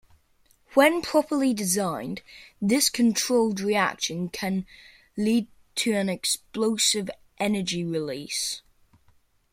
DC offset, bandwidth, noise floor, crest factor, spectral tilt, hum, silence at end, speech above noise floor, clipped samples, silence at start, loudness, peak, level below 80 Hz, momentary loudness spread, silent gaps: under 0.1%; 16.5 kHz; -63 dBFS; 22 dB; -3.5 dB/octave; none; 0.95 s; 38 dB; under 0.1%; 0.7 s; -25 LUFS; -4 dBFS; -62 dBFS; 11 LU; none